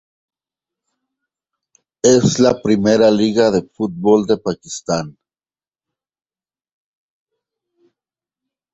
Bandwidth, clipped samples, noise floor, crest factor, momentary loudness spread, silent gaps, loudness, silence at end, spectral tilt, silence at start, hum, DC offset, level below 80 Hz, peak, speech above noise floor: 8.2 kHz; under 0.1%; under -90 dBFS; 18 dB; 11 LU; none; -15 LUFS; 3.65 s; -5 dB/octave; 2.05 s; none; under 0.1%; -54 dBFS; -2 dBFS; over 75 dB